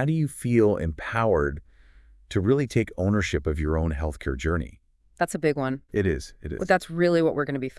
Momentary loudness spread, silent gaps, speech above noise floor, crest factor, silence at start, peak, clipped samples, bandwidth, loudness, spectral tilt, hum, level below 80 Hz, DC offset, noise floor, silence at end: 9 LU; none; 28 dB; 20 dB; 0 s; -6 dBFS; under 0.1%; 12 kHz; -25 LUFS; -7 dB/octave; none; -40 dBFS; under 0.1%; -53 dBFS; 0.1 s